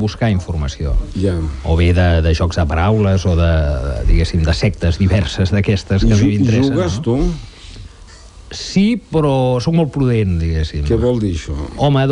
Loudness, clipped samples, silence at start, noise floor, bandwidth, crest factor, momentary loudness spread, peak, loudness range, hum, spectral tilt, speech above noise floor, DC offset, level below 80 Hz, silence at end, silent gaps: -16 LUFS; under 0.1%; 0 s; -38 dBFS; 10 kHz; 10 dB; 8 LU; -4 dBFS; 3 LU; none; -7 dB/octave; 24 dB; under 0.1%; -22 dBFS; 0 s; none